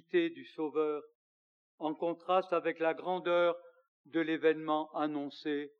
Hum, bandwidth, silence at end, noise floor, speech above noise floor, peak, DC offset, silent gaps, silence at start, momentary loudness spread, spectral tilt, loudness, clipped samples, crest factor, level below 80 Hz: none; 6.4 kHz; 0.1 s; under -90 dBFS; over 57 dB; -16 dBFS; under 0.1%; 1.15-1.78 s, 3.88-4.04 s; 0.15 s; 9 LU; -7 dB/octave; -34 LUFS; under 0.1%; 18 dB; under -90 dBFS